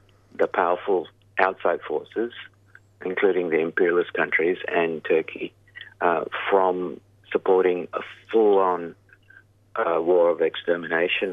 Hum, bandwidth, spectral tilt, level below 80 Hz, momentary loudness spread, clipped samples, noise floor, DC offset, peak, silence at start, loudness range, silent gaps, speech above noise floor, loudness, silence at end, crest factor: none; 4.7 kHz; -7 dB/octave; -70 dBFS; 14 LU; under 0.1%; -54 dBFS; under 0.1%; -2 dBFS; 0.4 s; 2 LU; none; 31 dB; -23 LUFS; 0 s; 22 dB